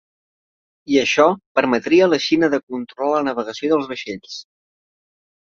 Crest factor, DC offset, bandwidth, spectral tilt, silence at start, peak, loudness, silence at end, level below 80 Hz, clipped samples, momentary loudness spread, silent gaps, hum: 18 dB; under 0.1%; 7.6 kHz; -4.5 dB/octave; 0.9 s; -2 dBFS; -18 LUFS; 1 s; -62 dBFS; under 0.1%; 15 LU; 1.46-1.55 s, 2.63-2.67 s; none